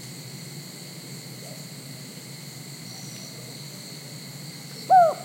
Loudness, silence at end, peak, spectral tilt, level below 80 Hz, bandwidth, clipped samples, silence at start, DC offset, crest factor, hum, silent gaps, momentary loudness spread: -30 LUFS; 0 s; -8 dBFS; -4 dB/octave; -76 dBFS; 16.5 kHz; under 0.1%; 0 s; under 0.1%; 20 dB; none; none; 12 LU